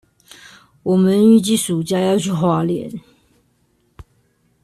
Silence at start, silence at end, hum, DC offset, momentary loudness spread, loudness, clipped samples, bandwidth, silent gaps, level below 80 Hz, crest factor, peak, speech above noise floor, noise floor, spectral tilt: 0.85 s; 0.6 s; none; under 0.1%; 15 LU; -16 LUFS; under 0.1%; 13.5 kHz; none; -54 dBFS; 16 dB; -2 dBFS; 46 dB; -62 dBFS; -6 dB/octave